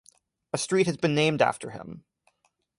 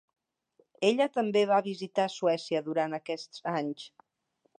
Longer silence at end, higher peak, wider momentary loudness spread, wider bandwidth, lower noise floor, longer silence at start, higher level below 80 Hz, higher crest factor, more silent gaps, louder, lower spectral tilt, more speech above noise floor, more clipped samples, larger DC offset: about the same, 0.8 s vs 0.7 s; first, -8 dBFS vs -12 dBFS; first, 19 LU vs 11 LU; first, 11.5 kHz vs 9.8 kHz; about the same, -72 dBFS vs -75 dBFS; second, 0.55 s vs 0.8 s; first, -66 dBFS vs -84 dBFS; about the same, 20 dB vs 20 dB; neither; first, -25 LUFS vs -30 LUFS; about the same, -4.5 dB/octave vs -5 dB/octave; about the same, 46 dB vs 46 dB; neither; neither